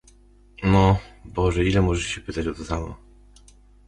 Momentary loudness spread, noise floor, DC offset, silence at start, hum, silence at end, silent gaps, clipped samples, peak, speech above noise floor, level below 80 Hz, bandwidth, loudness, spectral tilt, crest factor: 12 LU; -53 dBFS; under 0.1%; 0.6 s; 50 Hz at -40 dBFS; 0.9 s; none; under 0.1%; -4 dBFS; 31 dB; -34 dBFS; 11 kHz; -23 LUFS; -6.5 dB/octave; 18 dB